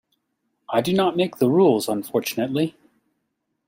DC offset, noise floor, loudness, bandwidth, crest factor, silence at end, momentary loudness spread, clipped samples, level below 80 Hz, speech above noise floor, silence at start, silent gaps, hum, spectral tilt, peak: under 0.1%; -76 dBFS; -21 LUFS; 16 kHz; 18 dB; 0.95 s; 8 LU; under 0.1%; -64 dBFS; 55 dB; 0.7 s; none; none; -6 dB/octave; -6 dBFS